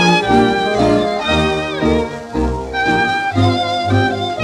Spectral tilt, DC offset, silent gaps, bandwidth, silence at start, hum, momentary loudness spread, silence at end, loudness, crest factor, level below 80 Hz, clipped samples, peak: -5.5 dB/octave; under 0.1%; none; 12 kHz; 0 s; none; 6 LU; 0 s; -15 LUFS; 14 dB; -32 dBFS; under 0.1%; -2 dBFS